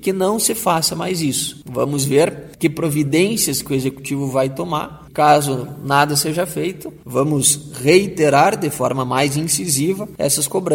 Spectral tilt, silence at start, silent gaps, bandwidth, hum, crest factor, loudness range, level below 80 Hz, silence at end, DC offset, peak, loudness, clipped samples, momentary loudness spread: -4 dB/octave; 0 s; none; 17 kHz; none; 18 dB; 2 LU; -50 dBFS; 0 s; under 0.1%; 0 dBFS; -17 LUFS; under 0.1%; 9 LU